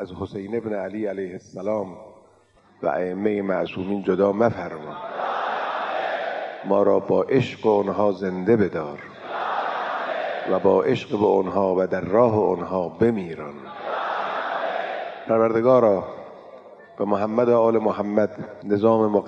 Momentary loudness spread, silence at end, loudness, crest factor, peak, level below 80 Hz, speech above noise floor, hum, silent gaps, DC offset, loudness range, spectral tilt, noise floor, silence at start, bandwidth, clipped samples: 13 LU; 0 s; -23 LUFS; 18 dB; -4 dBFS; -66 dBFS; 35 dB; none; none; under 0.1%; 4 LU; -8 dB/octave; -56 dBFS; 0 s; 7.6 kHz; under 0.1%